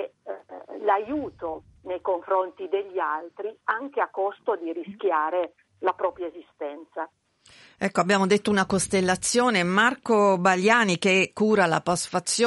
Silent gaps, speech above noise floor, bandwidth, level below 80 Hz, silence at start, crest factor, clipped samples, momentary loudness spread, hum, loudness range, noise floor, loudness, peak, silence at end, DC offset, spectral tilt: none; 30 dB; 11.5 kHz; -62 dBFS; 0 s; 20 dB; under 0.1%; 16 LU; none; 8 LU; -54 dBFS; -24 LUFS; -6 dBFS; 0 s; under 0.1%; -4 dB/octave